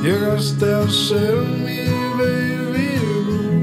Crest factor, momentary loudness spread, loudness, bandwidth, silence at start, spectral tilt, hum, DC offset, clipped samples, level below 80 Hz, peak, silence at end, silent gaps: 12 dB; 4 LU; -19 LUFS; 16 kHz; 0 s; -6 dB/octave; none; under 0.1%; under 0.1%; -48 dBFS; -6 dBFS; 0 s; none